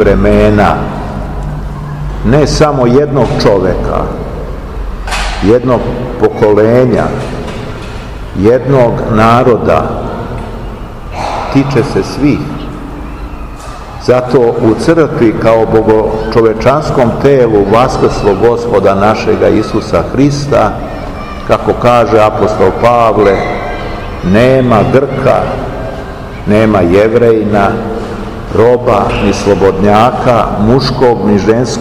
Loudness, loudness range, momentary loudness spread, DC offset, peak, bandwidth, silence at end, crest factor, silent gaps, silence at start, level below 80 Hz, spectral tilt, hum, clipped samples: -9 LUFS; 4 LU; 14 LU; 0.9%; 0 dBFS; 15 kHz; 0 s; 10 dB; none; 0 s; -24 dBFS; -7 dB/octave; none; 3%